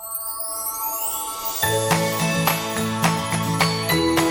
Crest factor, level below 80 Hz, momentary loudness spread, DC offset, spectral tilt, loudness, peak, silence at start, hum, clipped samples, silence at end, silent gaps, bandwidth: 18 dB; -50 dBFS; 6 LU; under 0.1%; -3.5 dB/octave; -21 LUFS; -4 dBFS; 0 s; none; under 0.1%; 0 s; none; 17 kHz